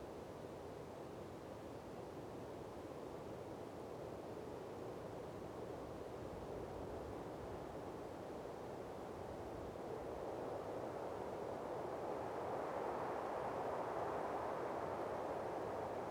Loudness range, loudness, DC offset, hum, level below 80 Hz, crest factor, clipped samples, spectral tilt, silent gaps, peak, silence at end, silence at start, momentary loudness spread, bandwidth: 7 LU; -47 LUFS; under 0.1%; none; -66 dBFS; 16 dB; under 0.1%; -6.5 dB/octave; none; -32 dBFS; 0 s; 0 s; 8 LU; 19.5 kHz